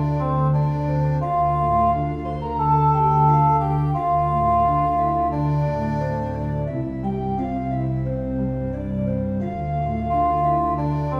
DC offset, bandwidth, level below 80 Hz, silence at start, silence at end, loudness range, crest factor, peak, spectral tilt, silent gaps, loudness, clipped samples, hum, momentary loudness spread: under 0.1%; 5.2 kHz; -36 dBFS; 0 s; 0 s; 6 LU; 14 dB; -6 dBFS; -10.5 dB/octave; none; -21 LUFS; under 0.1%; none; 8 LU